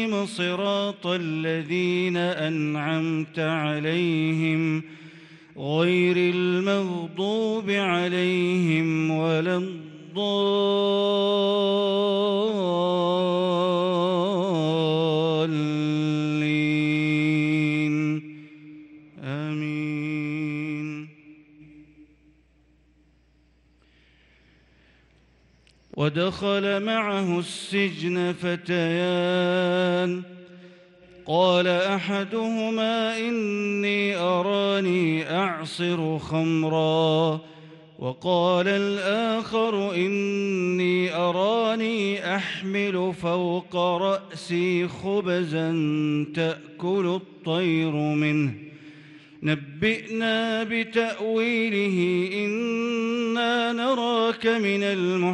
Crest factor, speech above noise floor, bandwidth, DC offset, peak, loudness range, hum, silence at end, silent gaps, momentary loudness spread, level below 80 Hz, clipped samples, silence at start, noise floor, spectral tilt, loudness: 16 dB; 37 dB; 11 kHz; under 0.1%; -8 dBFS; 4 LU; none; 0 s; none; 6 LU; -66 dBFS; under 0.1%; 0 s; -61 dBFS; -6.5 dB/octave; -24 LUFS